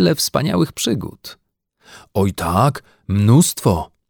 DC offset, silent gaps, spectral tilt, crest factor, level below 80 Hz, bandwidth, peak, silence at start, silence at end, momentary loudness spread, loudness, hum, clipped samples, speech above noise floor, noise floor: under 0.1%; none; -5.5 dB/octave; 16 dB; -42 dBFS; 19.5 kHz; -2 dBFS; 0 s; 0.25 s; 18 LU; -17 LUFS; none; under 0.1%; 37 dB; -54 dBFS